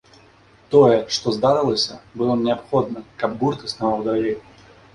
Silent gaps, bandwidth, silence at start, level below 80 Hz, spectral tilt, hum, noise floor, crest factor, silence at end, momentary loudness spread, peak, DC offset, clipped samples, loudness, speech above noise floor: none; 11 kHz; 0.7 s; -54 dBFS; -5.5 dB/octave; none; -51 dBFS; 18 dB; 0.55 s; 11 LU; -2 dBFS; under 0.1%; under 0.1%; -20 LUFS; 32 dB